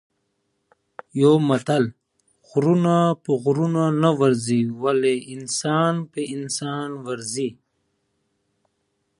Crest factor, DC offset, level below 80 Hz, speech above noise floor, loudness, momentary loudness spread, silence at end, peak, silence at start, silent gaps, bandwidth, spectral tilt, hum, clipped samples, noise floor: 20 dB; under 0.1%; -68 dBFS; 52 dB; -21 LUFS; 11 LU; 1.65 s; -4 dBFS; 1.15 s; none; 11.5 kHz; -6 dB/octave; none; under 0.1%; -72 dBFS